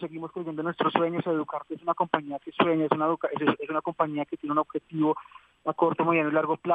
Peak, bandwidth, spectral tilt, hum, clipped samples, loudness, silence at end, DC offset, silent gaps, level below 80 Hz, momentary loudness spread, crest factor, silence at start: -4 dBFS; 4.7 kHz; -8.5 dB/octave; none; under 0.1%; -27 LUFS; 0 s; under 0.1%; none; -72 dBFS; 10 LU; 24 dB; 0 s